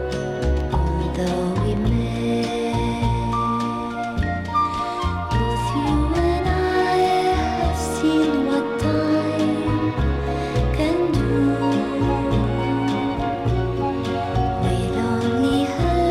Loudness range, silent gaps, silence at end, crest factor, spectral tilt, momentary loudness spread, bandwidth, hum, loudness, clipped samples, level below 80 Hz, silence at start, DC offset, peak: 3 LU; none; 0 s; 12 dB; -7 dB/octave; 4 LU; 13.5 kHz; none; -21 LUFS; under 0.1%; -30 dBFS; 0 s; under 0.1%; -8 dBFS